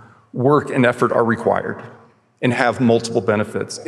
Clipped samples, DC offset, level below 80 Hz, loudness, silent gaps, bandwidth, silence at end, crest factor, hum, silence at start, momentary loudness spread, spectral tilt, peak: under 0.1%; under 0.1%; -68 dBFS; -18 LUFS; none; 12 kHz; 0 s; 18 dB; none; 0.35 s; 9 LU; -6 dB/octave; 0 dBFS